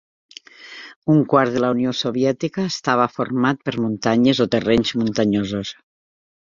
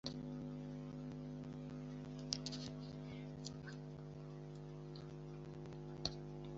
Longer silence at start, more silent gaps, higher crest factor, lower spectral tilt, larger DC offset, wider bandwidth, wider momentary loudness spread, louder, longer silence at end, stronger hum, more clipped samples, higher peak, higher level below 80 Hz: first, 0.6 s vs 0.05 s; first, 0.96-1.02 s vs none; second, 18 dB vs 30 dB; about the same, -6 dB/octave vs -5.5 dB/octave; neither; about the same, 7.6 kHz vs 7.6 kHz; first, 12 LU vs 8 LU; first, -19 LUFS vs -49 LUFS; first, 0.85 s vs 0 s; second, none vs 50 Hz at -65 dBFS; neither; first, -2 dBFS vs -18 dBFS; first, -52 dBFS vs -64 dBFS